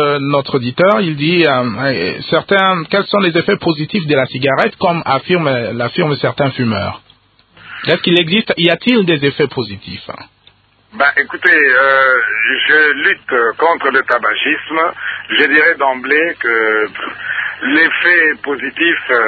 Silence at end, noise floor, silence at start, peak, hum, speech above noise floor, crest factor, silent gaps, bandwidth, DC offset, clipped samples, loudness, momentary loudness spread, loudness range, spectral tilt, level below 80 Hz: 0 s; -50 dBFS; 0 s; 0 dBFS; none; 37 dB; 14 dB; none; 7.2 kHz; under 0.1%; under 0.1%; -12 LUFS; 9 LU; 4 LU; -7.5 dB/octave; -50 dBFS